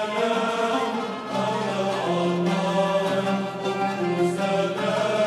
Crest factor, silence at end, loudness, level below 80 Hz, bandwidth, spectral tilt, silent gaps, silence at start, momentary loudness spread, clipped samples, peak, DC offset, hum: 12 dB; 0 s; -24 LUFS; -66 dBFS; 13 kHz; -5.5 dB/octave; none; 0 s; 4 LU; under 0.1%; -10 dBFS; under 0.1%; none